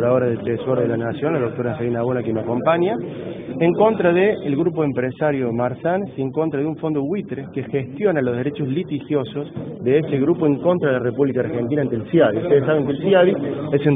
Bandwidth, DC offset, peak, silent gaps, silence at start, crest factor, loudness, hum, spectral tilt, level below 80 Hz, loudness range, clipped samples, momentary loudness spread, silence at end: 3.9 kHz; under 0.1%; -2 dBFS; none; 0 s; 16 dB; -20 LUFS; none; -11 dB/octave; -56 dBFS; 4 LU; under 0.1%; 8 LU; 0 s